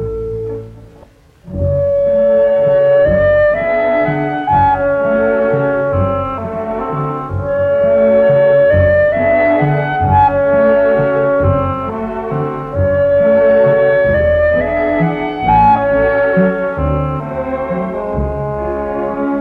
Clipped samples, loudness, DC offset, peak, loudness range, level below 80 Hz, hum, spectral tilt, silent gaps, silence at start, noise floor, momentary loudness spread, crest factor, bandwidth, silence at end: under 0.1%; -13 LUFS; under 0.1%; 0 dBFS; 4 LU; -32 dBFS; none; -9.5 dB/octave; none; 0 s; -43 dBFS; 10 LU; 12 dB; 4.5 kHz; 0 s